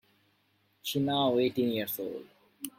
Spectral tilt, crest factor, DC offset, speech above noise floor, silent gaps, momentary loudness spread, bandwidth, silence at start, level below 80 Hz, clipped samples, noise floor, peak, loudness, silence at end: -5 dB/octave; 16 dB; under 0.1%; 42 dB; none; 14 LU; 16.5 kHz; 0.85 s; -72 dBFS; under 0.1%; -71 dBFS; -16 dBFS; -30 LUFS; 0.1 s